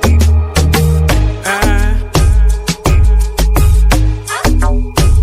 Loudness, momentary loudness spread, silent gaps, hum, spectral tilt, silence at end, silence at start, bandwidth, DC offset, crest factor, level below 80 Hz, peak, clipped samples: -12 LUFS; 4 LU; none; none; -5.5 dB/octave; 0 s; 0 s; 16 kHz; under 0.1%; 8 dB; -10 dBFS; 0 dBFS; under 0.1%